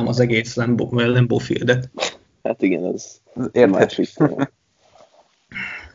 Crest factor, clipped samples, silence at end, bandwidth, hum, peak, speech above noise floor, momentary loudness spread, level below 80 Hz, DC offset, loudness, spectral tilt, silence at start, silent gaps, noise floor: 20 dB; under 0.1%; 0.05 s; 7.6 kHz; none; 0 dBFS; 35 dB; 13 LU; -54 dBFS; under 0.1%; -20 LUFS; -6.5 dB/octave; 0 s; none; -54 dBFS